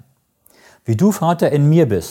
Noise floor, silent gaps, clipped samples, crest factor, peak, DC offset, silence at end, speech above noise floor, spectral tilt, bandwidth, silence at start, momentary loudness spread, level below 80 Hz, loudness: -56 dBFS; none; under 0.1%; 14 dB; -2 dBFS; under 0.1%; 0 s; 42 dB; -7.5 dB/octave; 17 kHz; 0.9 s; 8 LU; -52 dBFS; -15 LUFS